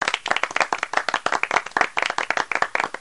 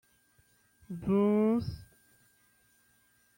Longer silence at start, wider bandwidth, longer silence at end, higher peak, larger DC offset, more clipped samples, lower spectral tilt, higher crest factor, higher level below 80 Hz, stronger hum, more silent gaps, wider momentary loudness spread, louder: second, 0 s vs 0.9 s; second, 11.5 kHz vs 16.5 kHz; second, 0 s vs 1.55 s; first, -4 dBFS vs -18 dBFS; first, 0.3% vs under 0.1%; neither; second, -1 dB/octave vs -9 dB/octave; about the same, 20 dB vs 16 dB; about the same, -64 dBFS vs -60 dBFS; neither; neither; second, 2 LU vs 19 LU; first, -22 LUFS vs -30 LUFS